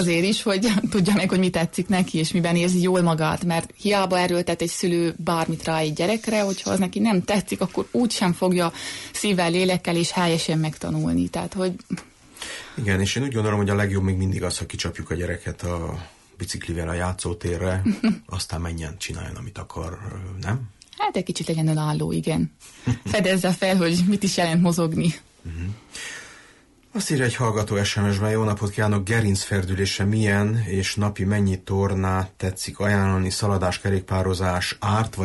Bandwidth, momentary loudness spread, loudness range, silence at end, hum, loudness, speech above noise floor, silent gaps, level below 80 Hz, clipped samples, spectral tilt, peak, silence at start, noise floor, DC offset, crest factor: 12 kHz; 12 LU; 6 LU; 0 s; none; -23 LUFS; 31 dB; none; -46 dBFS; under 0.1%; -5.5 dB/octave; -10 dBFS; 0 s; -53 dBFS; under 0.1%; 12 dB